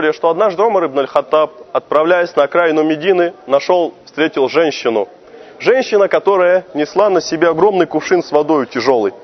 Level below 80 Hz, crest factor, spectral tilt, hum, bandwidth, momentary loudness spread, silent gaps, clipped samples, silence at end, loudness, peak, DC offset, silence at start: -60 dBFS; 14 dB; -5 dB/octave; none; 6.4 kHz; 5 LU; none; under 0.1%; 0 s; -14 LUFS; 0 dBFS; under 0.1%; 0 s